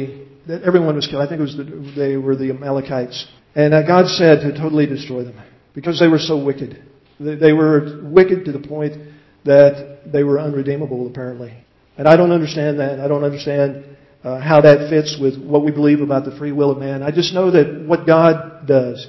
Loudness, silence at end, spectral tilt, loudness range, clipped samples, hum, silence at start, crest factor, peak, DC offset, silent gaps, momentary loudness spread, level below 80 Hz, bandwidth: -15 LUFS; 0 s; -7 dB/octave; 3 LU; under 0.1%; none; 0 s; 16 dB; 0 dBFS; under 0.1%; none; 16 LU; -56 dBFS; 6.2 kHz